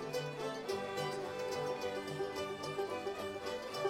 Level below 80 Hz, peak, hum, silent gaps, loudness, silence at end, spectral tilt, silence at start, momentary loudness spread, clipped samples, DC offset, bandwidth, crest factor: -72 dBFS; -24 dBFS; none; none; -40 LUFS; 0 s; -4.5 dB/octave; 0 s; 3 LU; under 0.1%; under 0.1%; 16.5 kHz; 16 dB